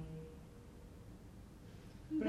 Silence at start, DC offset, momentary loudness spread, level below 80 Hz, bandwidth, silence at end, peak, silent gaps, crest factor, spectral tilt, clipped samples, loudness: 0 s; under 0.1%; 7 LU; -60 dBFS; 14.5 kHz; 0 s; -26 dBFS; none; 22 dB; -7.5 dB/octave; under 0.1%; -54 LUFS